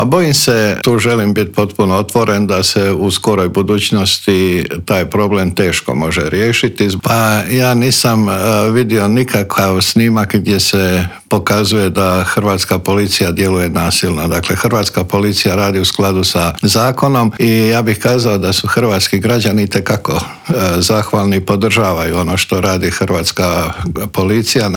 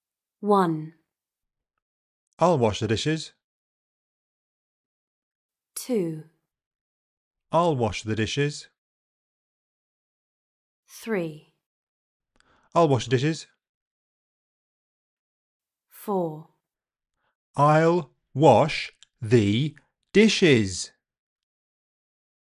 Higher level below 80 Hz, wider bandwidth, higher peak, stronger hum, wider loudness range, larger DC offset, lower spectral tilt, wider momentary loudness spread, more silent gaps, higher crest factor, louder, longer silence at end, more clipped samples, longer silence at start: first, -42 dBFS vs -56 dBFS; first, 19.5 kHz vs 16 kHz; first, 0 dBFS vs -4 dBFS; neither; second, 2 LU vs 15 LU; neither; about the same, -4.5 dB/octave vs -5.5 dB/octave; second, 4 LU vs 18 LU; second, none vs 1.82-2.37 s, 3.44-5.49 s, 6.66-7.31 s, 8.78-10.83 s, 11.66-12.20 s, 13.69-15.60 s, 17.35-17.54 s; second, 12 dB vs 22 dB; first, -12 LUFS vs -23 LUFS; second, 0 s vs 1.55 s; neither; second, 0 s vs 0.4 s